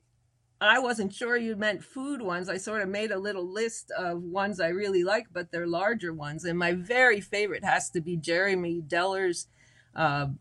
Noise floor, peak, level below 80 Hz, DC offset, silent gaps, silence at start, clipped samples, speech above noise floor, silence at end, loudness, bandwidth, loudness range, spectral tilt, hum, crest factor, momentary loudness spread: -70 dBFS; -8 dBFS; -66 dBFS; under 0.1%; none; 0.6 s; under 0.1%; 42 dB; 0.05 s; -28 LUFS; 12 kHz; 4 LU; -4 dB/octave; none; 20 dB; 10 LU